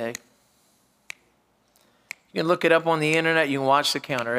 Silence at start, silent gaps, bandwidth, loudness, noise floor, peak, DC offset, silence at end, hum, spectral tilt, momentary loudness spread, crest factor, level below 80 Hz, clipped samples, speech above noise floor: 0 s; none; 16 kHz; -22 LUFS; -65 dBFS; -4 dBFS; under 0.1%; 0 s; none; -4 dB/octave; 22 LU; 22 dB; -74 dBFS; under 0.1%; 43 dB